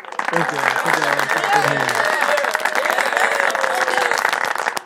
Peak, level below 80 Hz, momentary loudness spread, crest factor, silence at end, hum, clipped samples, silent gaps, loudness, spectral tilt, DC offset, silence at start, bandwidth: 0 dBFS; -70 dBFS; 3 LU; 18 dB; 0 s; none; under 0.1%; none; -17 LUFS; -2.5 dB/octave; under 0.1%; 0 s; 17 kHz